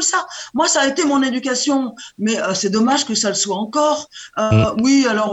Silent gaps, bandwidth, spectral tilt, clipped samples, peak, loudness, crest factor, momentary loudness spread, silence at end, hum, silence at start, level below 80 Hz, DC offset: none; 8.8 kHz; -3.5 dB/octave; under 0.1%; -2 dBFS; -17 LUFS; 14 dB; 8 LU; 0 s; none; 0 s; -48 dBFS; under 0.1%